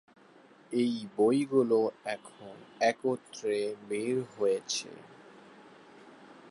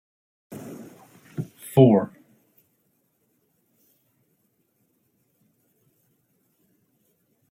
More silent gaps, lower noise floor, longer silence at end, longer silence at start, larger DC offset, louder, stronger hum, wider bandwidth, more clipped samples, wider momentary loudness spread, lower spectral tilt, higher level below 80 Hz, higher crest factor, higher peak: neither; second, -58 dBFS vs -70 dBFS; second, 0 s vs 5.45 s; first, 0.7 s vs 0.5 s; neither; second, -31 LUFS vs -21 LUFS; neither; second, 11.5 kHz vs 16 kHz; neither; second, 17 LU vs 27 LU; second, -4.5 dB/octave vs -8.5 dB/octave; second, -82 dBFS vs -70 dBFS; second, 18 dB vs 26 dB; second, -14 dBFS vs -4 dBFS